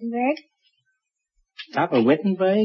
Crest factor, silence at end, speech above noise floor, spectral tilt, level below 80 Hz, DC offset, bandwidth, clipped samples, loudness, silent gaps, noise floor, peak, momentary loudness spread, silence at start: 16 dB; 0 s; 55 dB; -8.5 dB/octave; -72 dBFS; under 0.1%; 6.2 kHz; under 0.1%; -22 LUFS; none; -75 dBFS; -8 dBFS; 12 LU; 0 s